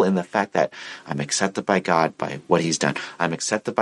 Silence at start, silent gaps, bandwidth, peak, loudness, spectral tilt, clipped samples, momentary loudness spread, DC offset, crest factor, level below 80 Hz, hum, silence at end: 0 s; none; 11.5 kHz; -2 dBFS; -23 LUFS; -4 dB/octave; under 0.1%; 8 LU; under 0.1%; 20 dB; -64 dBFS; none; 0 s